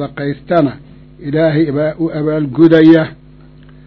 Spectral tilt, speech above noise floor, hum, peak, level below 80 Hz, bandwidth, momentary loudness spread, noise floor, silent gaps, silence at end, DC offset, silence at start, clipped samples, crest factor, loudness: -10 dB/octave; 28 dB; none; 0 dBFS; -44 dBFS; 5.8 kHz; 13 LU; -39 dBFS; none; 0.75 s; under 0.1%; 0 s; 0.7%; 14 dB; -12 LUFS